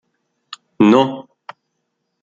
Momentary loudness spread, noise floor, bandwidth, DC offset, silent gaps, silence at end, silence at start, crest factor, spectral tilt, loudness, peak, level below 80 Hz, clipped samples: 25 LU; -73 dBFS; 7.6 kHz; under 0.1%; none; 1 s; 0.5 s; 18 dB; -7 dB/octave; -14 LUFS; -2 dBFS; -58 dBFS; under 0.1%